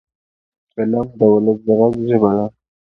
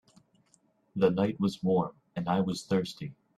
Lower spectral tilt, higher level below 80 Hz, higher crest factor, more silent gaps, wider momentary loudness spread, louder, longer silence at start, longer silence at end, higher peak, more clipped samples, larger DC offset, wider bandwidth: first, -11 dB/octave vs -7 dB/octave; first, -52 dBFS vs -66 dBFS; about the same, 16 dB vs 20 dB; neither; about the same, 10 LU vs 11 LU; first, -16 LUFS vs -30 LUFS; second, 0.75 s vs 0.95 s; about the same, 0.35 s vs 0.25 s; first, 0 dBFS vs -12 dBFS; neither; neither; second, 3.8 kHz vs 12.5 kHz